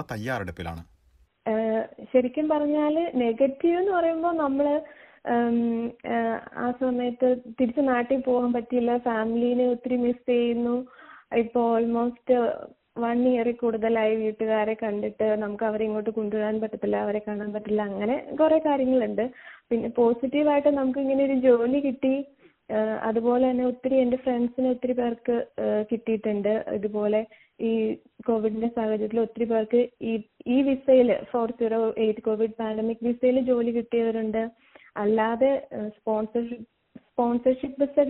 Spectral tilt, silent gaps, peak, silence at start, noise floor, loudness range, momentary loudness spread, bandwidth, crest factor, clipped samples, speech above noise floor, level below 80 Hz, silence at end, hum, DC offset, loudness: -5.5 dB/octave; none; -8 dBFS; 0 s; -62 dBFS; 3 LU; 8 LU; 4.5 kHz; 16 dB; under 0.1%; 37 dB; -62 dBFS; 0 s; none; under 0.1%; -25 LUFS